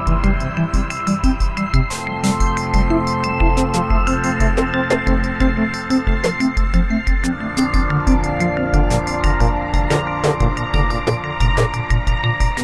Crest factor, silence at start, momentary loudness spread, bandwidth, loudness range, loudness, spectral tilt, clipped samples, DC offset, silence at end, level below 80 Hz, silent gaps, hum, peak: 14 dB; 0 s; 3 LU; 11.5 kHz; 1 LU; -18 LUFS; -6 dB/octave; under 0.1%; under 0.1%; 0 s; -20 dBFS; none; none; -2 dBFS